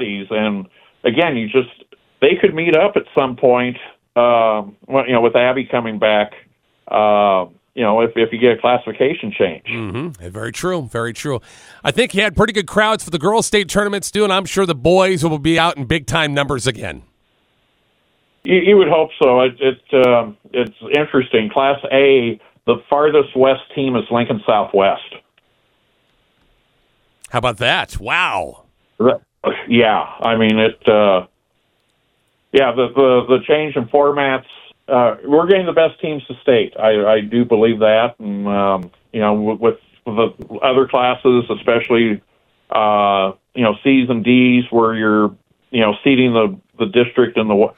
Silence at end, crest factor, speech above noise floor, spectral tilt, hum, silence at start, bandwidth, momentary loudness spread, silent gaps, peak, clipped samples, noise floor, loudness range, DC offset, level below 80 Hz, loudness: 0.1 s; 16 dB; 49 dB; -5 dB/octave; none; 0 s; 15 kHz; 10 LU; none; 0 dBFS; under 0.1%; -64 dBFS; 5 LU; under 0.1%; -46 dBFS; -15 LUFS